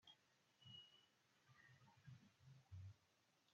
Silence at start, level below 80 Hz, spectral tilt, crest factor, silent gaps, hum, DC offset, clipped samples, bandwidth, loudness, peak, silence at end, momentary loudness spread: 0 s; -90 dBFS; -3.5 dB/octave; 16 dB; none; none; under 0.1%; under 0.1%; 7.2 kHz; -65 LUFS; -52 dBFS; 0 s; 7 LU